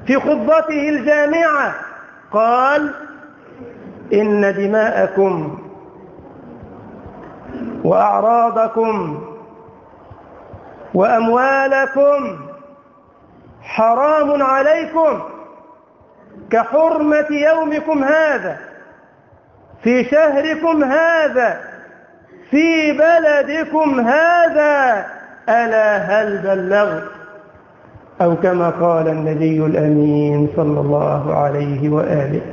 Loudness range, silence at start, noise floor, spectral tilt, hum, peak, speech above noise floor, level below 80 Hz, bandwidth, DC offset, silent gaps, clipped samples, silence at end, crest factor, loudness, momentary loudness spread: 4 LU; 0 s; -48 dBFS; -7.5 dB/octave; none; -2 dBFS; 34 dB; -54 dBFS; 7.2 kHz; under 0.1%; none; under 0.1%; 0 s; 14 dB; -15 LUFS; 16 LU